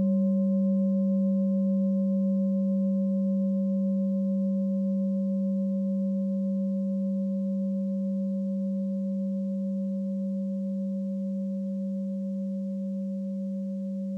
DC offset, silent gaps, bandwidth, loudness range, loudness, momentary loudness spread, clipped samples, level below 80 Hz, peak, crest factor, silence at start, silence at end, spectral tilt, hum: under 0.1%; none; 1.1 kHz; 5 LU; -28 LUFS; 7 LU; under 0.1%; under -90 dBFS; -18 dBFS; 8 dB; 0 s; 0 s; -12.5 dB/octave; none